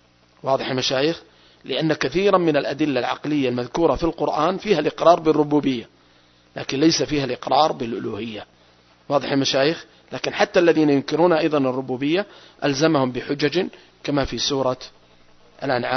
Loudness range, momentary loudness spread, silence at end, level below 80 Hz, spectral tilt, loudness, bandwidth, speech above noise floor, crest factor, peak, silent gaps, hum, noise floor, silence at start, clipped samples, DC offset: 3 LU; 13 LU; 0 s; -48 dBFS; -5 dB/octave; -21 LUFS; 6.4 kHz; 35 dB; 20 dB; 0 dBFS; none; 60 Hz at -60 dBFS; -55 dBFS; 0.45 s; under 0.1%; under 0.1%